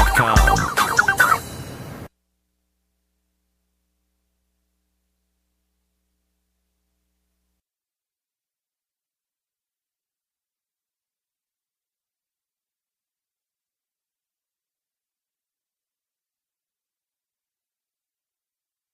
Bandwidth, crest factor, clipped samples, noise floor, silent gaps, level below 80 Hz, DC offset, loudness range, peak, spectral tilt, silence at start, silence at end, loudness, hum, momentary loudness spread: 15.5 kHz; 26 dB; under 0.1%; under -90 dBFS; none; -34 dBFS; under 0.1%; 22 LU; -2 dBFS; -3.5 dB/octave; 0 s; 16.85 s; -17 LUFS; none; 20 LU